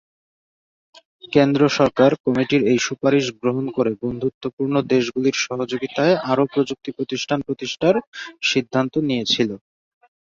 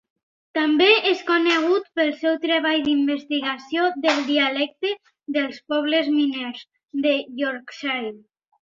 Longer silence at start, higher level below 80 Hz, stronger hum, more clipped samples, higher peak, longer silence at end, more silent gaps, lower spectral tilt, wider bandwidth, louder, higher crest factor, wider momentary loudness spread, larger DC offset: first, 1.25 s vs 0.55 s; first, -58 dBFS vs -68 dBFS; neither; neither; about the same, -2 dBFS vs -4 dBFS; first, 0.65 s vs 0.45 s; first, 2.20-2.24 s, 4.34-4.41 s, 4.53-4.57 s, 8.07-8.12 s vs none; first, -5 dB/octave vs -3 dB/octave; about the same, 7.6 kHz vs 7.6 kHz; about the same, -20 LUFS vs -21 LUFS; about the same, 20 dB vs 18 dB; about the same, 9 LU vs 10 LU; neither